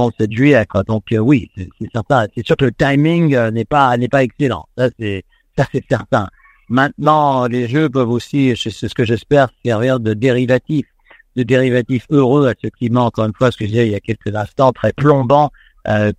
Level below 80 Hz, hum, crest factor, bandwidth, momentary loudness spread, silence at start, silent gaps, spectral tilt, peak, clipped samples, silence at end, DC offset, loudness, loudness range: -44 dBFS; none; 14 dB; 10 kHz; 9 LU; 0 s; none; -7.5 dB/octave; 0 dBFS; under 0.1%; 0.05 s; under 0.1%; -15 LUFS; 2 LU